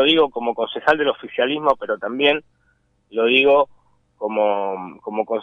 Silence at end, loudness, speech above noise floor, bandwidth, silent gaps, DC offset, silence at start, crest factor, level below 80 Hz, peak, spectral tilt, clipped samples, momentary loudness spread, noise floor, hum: 0 s; -19 LUFS; 44 dB; 6.6 kHz; none; under 0.1%; 0 s; 18 dB; -60 dBFS; -2 dBFS; -5.5 dB/octave; under 0.1%; 12 LU; -63 dBFS; none